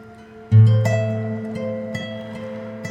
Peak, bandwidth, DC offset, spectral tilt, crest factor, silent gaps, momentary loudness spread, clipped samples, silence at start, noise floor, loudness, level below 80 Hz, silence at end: -4 dBFS; 7.8 kHz; under 0.1%; -8 dB/octave; 16 dB; none; 17 LU; under 0.1%; 0 s; -41 dBFS; -20 LUFS; -56 dBFS; 0 s